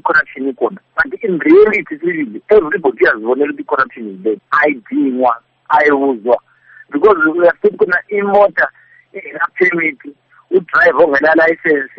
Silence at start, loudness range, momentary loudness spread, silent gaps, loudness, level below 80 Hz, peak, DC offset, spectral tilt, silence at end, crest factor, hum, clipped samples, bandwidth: 0.05 s; 2 LU; 10 LU; none; -13 LUFS; -52 dBFS; 0 dBFS; under 0.1%; -3.5 dB/octave; 0.1 s; 12 dB; none; under 0.1%; 6 kHz